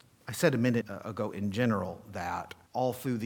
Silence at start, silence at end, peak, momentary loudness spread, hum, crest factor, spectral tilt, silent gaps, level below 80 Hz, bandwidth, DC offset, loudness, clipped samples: 0.25 s; 0 s; -10 dBFS; 11 LU; none; 22 dB; -6 dB/octave; none; -66 dBFS; 19 kHz; under 0.1%; -32 LUFS; under 0.1%